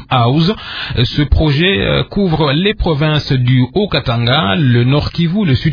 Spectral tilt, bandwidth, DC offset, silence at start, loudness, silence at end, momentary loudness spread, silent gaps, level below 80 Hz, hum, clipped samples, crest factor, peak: -8 dB/octave; 5.4 kHz; under 0.1%; 0 s; -13 LUFS; 0 s; 4 LU; none; -26 dBFS; none; under 0.1%; 12 dB; 0 dBFS